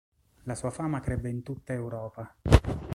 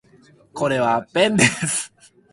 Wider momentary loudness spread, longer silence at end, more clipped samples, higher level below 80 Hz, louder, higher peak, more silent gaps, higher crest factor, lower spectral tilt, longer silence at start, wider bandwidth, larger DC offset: about the same, 15 LU vs 14 LU; second, 0 s vs 0.45 s; neither; first, -34 dBFS vs -56 dBFS; second, -30 LUFS vs -19 LUFS; about the same, -2 dBFS vs -2 dBFS; neither; first, 26 dB vs 20 dB; first, -6.5 dB/octave vs -3.5 dB/octave; about the same, 0.45 s vs 0.55 s; about the same, 12.5 kHz vs 11.5 kHz; neither